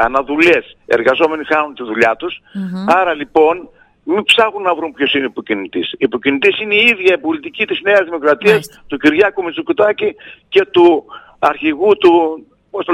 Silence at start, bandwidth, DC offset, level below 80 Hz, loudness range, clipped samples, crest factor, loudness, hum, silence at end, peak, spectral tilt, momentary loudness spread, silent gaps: 0 s; 13 kHz; under 0.1%; -50 dBFS; 2 LU; under 0.1%; 14 dB; -13 LUFS; none; 0 s; 0 dBFS; -5 dB/octave; 11 LU; none